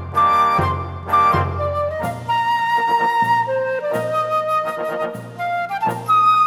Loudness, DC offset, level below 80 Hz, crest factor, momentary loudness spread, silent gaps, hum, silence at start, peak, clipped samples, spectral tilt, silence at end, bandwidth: -19 LUFS; under 0.1%; -46 dBFS; 14 dB; 9 LU; none; none; 0 s; -4 dBFS; under 0.1%; -5.5 dB/octave; 0 s; 16 kHz